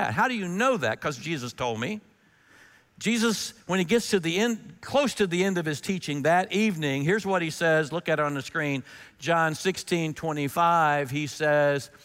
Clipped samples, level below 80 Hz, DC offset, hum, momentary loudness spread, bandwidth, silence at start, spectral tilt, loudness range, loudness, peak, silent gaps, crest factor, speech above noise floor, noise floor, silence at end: under 0.1%; -64 dBFS; under 0.1%; none; 8 LU; 16 kHz; 0 s; -4.5 dB/octave; 3 LU; -26 LUFS; -10 dBFS; none; 16 dB; 33 dB; -59 dBFS; 0.15 s